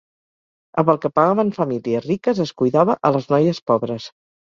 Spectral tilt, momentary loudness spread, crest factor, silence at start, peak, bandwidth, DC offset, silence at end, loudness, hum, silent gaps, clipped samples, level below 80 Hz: -8 dB/octave; 8 LU; 18 dB; 0.75 s; -2 dBFS; 7.4 kHz; under 0.1%; 0.5 s; -19 LUFS; none; 3.62-3.66 s; under 0.1%; -60 dBFS